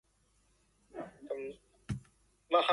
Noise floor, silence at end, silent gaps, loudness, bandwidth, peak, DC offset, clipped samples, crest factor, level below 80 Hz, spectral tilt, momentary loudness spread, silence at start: -72 dBFS; 0 s; none; -39 LUFS; 11.5 kHz; -14 dBFS; under 0.1%; under 0.1%; 22 dB; -62 dBFS; -5.5 dB/octave; 18 LU; 0.95 s